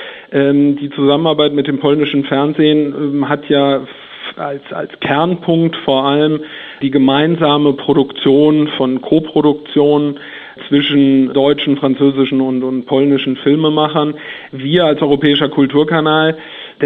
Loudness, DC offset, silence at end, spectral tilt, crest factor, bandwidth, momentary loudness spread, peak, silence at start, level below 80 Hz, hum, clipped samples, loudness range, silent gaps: -13 LUFS; under 0.1%; 0 s; -9 dB/octave; 12 dB; 4.2 kHz; 11 LU; 0 dBFS; 0 s; -54 dBFS; none; under 0.1%; 3 LU; none